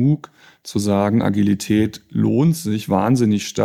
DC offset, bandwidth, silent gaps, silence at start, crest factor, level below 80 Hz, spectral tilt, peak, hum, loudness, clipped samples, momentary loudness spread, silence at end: under 0.1%; 15.5 kHz; none; 0 s; 14 dB; -58 dBFS; -6.5 dB/octave; -4 dBFS; none; -19 LUFS; under 0.1%; 7 LU; 0 s